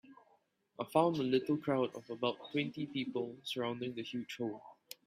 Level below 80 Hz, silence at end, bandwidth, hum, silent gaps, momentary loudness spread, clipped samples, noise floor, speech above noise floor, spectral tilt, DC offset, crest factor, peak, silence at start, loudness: -80 dBFS; 0.35 s; 15.5 kHz; none; none; 10 LU; under 0.1%; -73 dBFS; 37 dB; -6 dB/octave; under 0.1%; 22 dB; -16 dBFS; 0.1 s; -37 LUFS